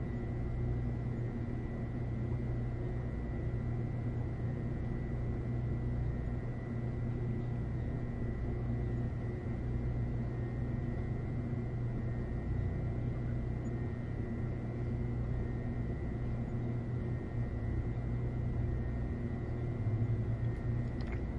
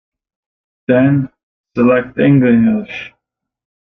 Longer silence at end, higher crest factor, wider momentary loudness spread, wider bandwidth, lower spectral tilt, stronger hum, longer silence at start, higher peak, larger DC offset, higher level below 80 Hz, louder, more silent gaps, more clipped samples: second, 0 s vs 0.75 s; about the same, 12 dB vs 14 dB; second, 2 LU vs 17 LU; first, 5 kHz vs 4 kHz; about the same, -10 dB/octave vs -10 dB/octave; neither; second, 0 s vs 0.9 s; second, -24 dBFS vs -2 dBFS; neither; first, -42 dBFS vs -50 dBFS; second, -38 LUFS vs -13 LUFS; second, none vs 1.43-1.64 s; neither